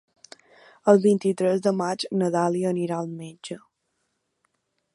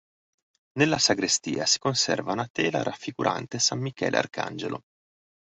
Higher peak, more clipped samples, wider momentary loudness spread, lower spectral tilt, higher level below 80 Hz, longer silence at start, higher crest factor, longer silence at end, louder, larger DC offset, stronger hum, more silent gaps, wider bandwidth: first, -2 dBFS vs -6 dBFS; neither; first, 19 LU vs 11 LU; first, -6.5 dB/octave vs -3 dB/octave; second, -76 dBFS vs -64 dBFS; about the same, 0.85 s vs 0.75 s; about the same, 22 dB vs 22 dB; first, 1.4 s vs 0.7 s; about the same, -23 LUFS vs -25 LUFS; neither; neither; second, none vs 2.50-2.55 s; first, 11.5 kHz vs 8.4 kHz